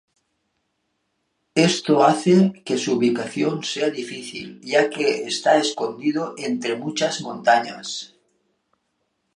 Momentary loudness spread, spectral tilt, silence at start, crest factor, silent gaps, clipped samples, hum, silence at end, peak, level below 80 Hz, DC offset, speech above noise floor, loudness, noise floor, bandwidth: 14 LU; -4.5 dB/octave; 1.55 s; 20 dB; none; under 0.1%; none; 1.3 s; -2 dBFS; -72 dBFS; under 0.1%; 52 dB; -21 LUFS; -73 dBFS; 11.5 kHz